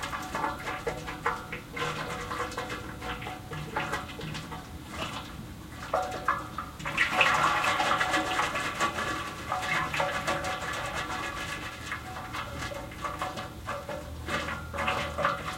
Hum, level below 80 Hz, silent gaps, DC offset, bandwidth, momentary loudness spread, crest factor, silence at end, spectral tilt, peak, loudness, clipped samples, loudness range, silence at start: none; -50 dBFS; none; under 0.1%; 16.5 kHz; 12 LU; 24 dB; 0 s; -3.5 dB/octave; -8 dBFS; -31 LUFS; under 0.1%; 9 LU; 0 s